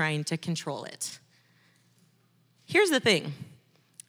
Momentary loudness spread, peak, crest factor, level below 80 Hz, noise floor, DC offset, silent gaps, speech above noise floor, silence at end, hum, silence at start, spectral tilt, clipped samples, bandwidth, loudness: 21 LU; -8 dBFS; 24 dB; -82 dBFS; -66 dBFS; under 0.1%; none; 38 dB; 0.55 s; none; 0 s; -4 dB/octave; under 0.1%; over 20 kHz; -27 LUFS